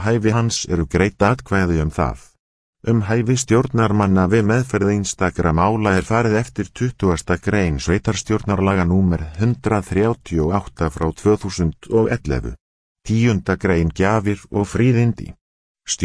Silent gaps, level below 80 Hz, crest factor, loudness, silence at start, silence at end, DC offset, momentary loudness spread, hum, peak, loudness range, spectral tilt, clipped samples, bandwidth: 2.39-2.73 s, 12.61-12.95 s, 15.41-15.75 s; -34 dBFS; 18 dB; -19 LUFS; 0 s; 0 s; under 0.1%; 7 LU; none; 0 dBFS; 3 LU; -6 dB/octave; under 0.1%; 11 kHz